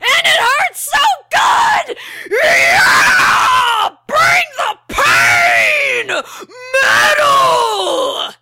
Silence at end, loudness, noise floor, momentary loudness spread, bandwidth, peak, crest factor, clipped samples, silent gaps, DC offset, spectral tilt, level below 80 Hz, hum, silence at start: 0.1 s; -11 LUFS; -31 dBFS; 10 LU; 16.5 kHz; -2 dBFS; 10 dB; under 0.1%; none; under 0.1%; -0.5 dB/octave; -46 dBFS; none; 0 s